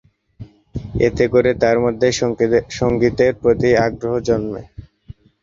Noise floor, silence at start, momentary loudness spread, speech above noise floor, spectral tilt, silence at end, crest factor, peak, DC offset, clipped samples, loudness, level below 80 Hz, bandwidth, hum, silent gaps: -42 dBFS; 0.4 s; 12 LU; 26 dB; -6 dB/octave; 0.3 s; 16 dB; -2 dBFS; under 0.1%; under 0.1%; -17 LUFS; -40 dBFS; 7.6 kHz; none; none